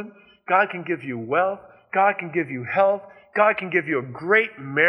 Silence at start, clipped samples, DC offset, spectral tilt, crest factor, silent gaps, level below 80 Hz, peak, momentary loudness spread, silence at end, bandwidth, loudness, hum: 0 s; under 0.1%; under 0.1%; -8 dB/octave; 18 dB; none; -72 dBFS; -4 dBFS; 9 LU; 0 s; 5.6 kHz; -22 LUFS; none